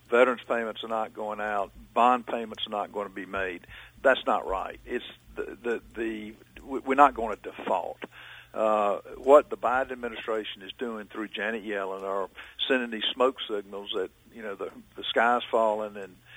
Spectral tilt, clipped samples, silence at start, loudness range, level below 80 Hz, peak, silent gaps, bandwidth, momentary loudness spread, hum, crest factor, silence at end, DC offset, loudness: -4.5 dB/octave; under 0.1%; 0.1 s; 5 LU; -58 dBFS; -4 dBFS; none; over 20 kHz; 16 LU; none; 24 dB; 0 s; under 0.1%; -28 LUFS